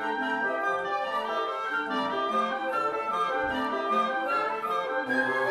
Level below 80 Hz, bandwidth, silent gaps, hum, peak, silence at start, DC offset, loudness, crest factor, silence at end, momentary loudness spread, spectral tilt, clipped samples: -64 dBFS; 14 kHz; none; none; -14 dBFS; 0 s; under 0.1%; -28 LUFS; 14 dB; 0 s; 3 LU; -4 dB/octave; under 0.1%